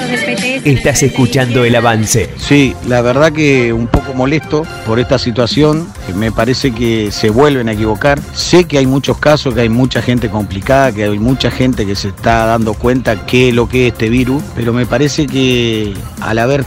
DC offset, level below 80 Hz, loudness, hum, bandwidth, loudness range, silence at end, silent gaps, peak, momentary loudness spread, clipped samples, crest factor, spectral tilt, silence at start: under 0.1%; -28 dBFS; -12 LUFS; none; 16.5 kHz; 2 LU; 0 s; none; 0 dBFS; 6 LU; 0.2%; 12 dB; -5.5 dB/octave; 0 s